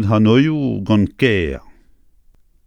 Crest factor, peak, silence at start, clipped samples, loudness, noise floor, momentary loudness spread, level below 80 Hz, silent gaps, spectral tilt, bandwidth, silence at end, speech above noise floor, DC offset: 16 dB; 0 dBFS; 0 s; under 0.1%; -16 LUFS; -51 dBFS; 10 LU; -40 dBFS; none; -8 dB/octave; 9.8 kHz; 1.05 s; 36 dB; under 0.1%